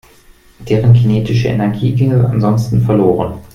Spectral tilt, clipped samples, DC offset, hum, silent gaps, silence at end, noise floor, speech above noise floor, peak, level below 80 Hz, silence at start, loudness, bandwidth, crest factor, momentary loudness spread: -9 dB/octave; under 0.1%; under 0.1%; none; none; 0.1 s; -44 dBFS; 33 dB; 0 dBFS; -38 dBFS; 0.6 s; -13 LUFS; 6.8 kHz; 12 dB; 5 LU